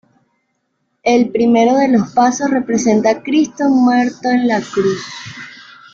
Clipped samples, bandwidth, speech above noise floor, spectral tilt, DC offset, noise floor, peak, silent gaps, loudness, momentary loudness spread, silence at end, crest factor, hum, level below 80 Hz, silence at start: under 0.1%; 7.6 kHz; 54 dB; -5 dB/octave; under 0.1%; -68 dBFS; -2 dBFS; none; -14 LUFS; 13 LU; 0.3 s; 14 dB; none; -56 dBFS; 1.05 s